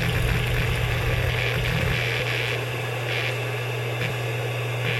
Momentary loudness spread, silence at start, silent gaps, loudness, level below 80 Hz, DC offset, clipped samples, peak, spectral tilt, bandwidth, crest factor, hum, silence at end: 4 LU; 0 s; none; -25 LUFS; -34 dBFS; under 0.1%; under 0.1%; -10 dBFS; -5 dB/octave; 16 kHz; 14 dB; none; 0 s